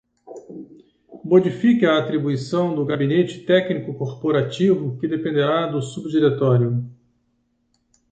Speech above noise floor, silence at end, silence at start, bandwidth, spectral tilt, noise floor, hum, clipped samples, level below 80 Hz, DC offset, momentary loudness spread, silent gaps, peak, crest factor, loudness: 49 dB; 1.2 s; 0.3 s; 9 kHz; -7.5 dB/octave; -68 dBFS; none; under 0.1%; -62 dBFS; under 0.1%; 17 LU; none; -4 dBFS; 18 dB; -20 LUFS